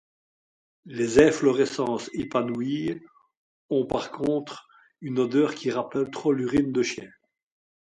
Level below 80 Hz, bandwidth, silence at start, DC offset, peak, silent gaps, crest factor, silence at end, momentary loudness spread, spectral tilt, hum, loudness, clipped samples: -56 dBFS; 11 kHz; 0.85 s; under 0.1%; -4 dBFS; 3.37-3.69 s; 22 dB; 0.9 s; 14 LU; -5.5 dB/octave; none; -25 LUFS; under 0.1%